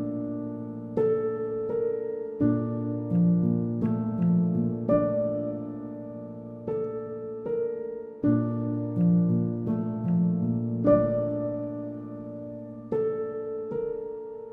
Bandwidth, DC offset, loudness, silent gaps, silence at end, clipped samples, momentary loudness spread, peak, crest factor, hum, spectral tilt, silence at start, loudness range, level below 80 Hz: 2.8 kHz; under 0.1%; -28 LUFS; none; 0 s; under 0.1%; 14 LU; -10 dBFS; 18 dB; none; -13 dB/octave; 0 s; 6 LU; -58 dBFS